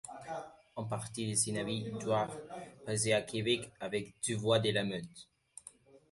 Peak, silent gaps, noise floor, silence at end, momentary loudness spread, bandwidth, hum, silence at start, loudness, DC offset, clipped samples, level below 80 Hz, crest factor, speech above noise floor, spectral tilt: -16 dBFS; none; -58 dBFS; 0.15 s; 20 LU; 12 kHz; none; 0.05 s; -35 LUFS; under 0.1%; under 0.1%; -68 dBFS; 20 dB; 24 dB; -4 dB/octave